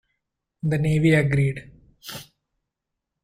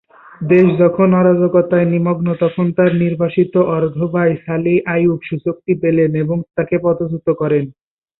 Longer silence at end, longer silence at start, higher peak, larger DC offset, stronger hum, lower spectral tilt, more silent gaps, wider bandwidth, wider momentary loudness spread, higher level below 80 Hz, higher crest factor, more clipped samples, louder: first, 1 s vs 0.5 s; first, 0.65 s vs 0.4 s; second, -8 dBFS vs -2 dBFS; neither; neither; second, -7 dB/octave vs -11.5 dB/octave; neither; first, 16 kHz vs 4.1 kHz; first, 20 LU vs 7 LU; about the same, -50 dBFS vs -52 dBFS; about the same, 18 dB vs 14 dB; neither; second, -21 LUFS vs -15 LUFS